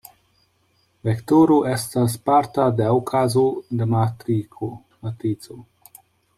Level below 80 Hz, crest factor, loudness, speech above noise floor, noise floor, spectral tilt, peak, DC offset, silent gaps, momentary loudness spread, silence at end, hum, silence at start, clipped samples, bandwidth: -58 dBFS; 16 dB; -20 LUFS; 44 dB; -64 dBFS; -7 dB/octave; -4 dBFS; under 0.1%; none; 15 LU; 0.75 s; none; 1.05 s; under 0.1%; 16 kHz